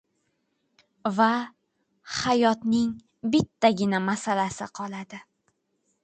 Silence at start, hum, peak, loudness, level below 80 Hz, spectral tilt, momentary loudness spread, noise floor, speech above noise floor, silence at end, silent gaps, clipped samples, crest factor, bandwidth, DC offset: 1.05 s; none; -6 dBFS; -25 LUFS; -62 dBFS; -5 dB/octave; 13 LU; -74 dBFS; 49 dB; 0.8 s; none; under 0.1%; 20 dB; 9.2 kHz; under 0.1%